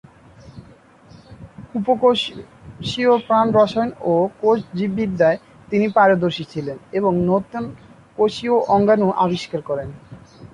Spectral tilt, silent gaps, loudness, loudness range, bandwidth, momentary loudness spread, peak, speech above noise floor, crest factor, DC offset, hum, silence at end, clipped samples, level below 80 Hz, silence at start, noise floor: -6.5 dB/octave; none; -19 LUFS; 2 LU; 11 kHz; 14 LU; -2 dBFS; 29 dB; 16 dB; under 0.1%; none; 0.1 s; under 0.1%; -52 dBFS; 0.45 s; -47 dBFS